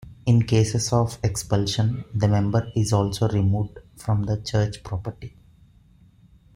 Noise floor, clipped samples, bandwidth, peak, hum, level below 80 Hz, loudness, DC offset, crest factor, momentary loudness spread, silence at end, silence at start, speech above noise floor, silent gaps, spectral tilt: -54 dBFS; under 0.1%; 15.5 kHz; -6 dBFS; none; -46 dBFS; -23 LUFS; under 0.1%; 16 dB; 11 LU; 1.25 s; 0 s; 32 dB; none; -6 dB/octave